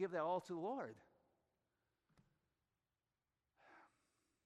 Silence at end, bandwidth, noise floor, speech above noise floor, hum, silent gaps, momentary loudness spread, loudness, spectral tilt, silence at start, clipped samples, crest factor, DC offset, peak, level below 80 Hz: 0.6 s; 10 kHz; under -90 dBFS; over 45 dB; none; none; 13 LU; -45 LUFS; -6.5 dB/octave; 0 s; under 0.1%; 20 dB; under 0.1%; -30 dBFS; under -90 dBFS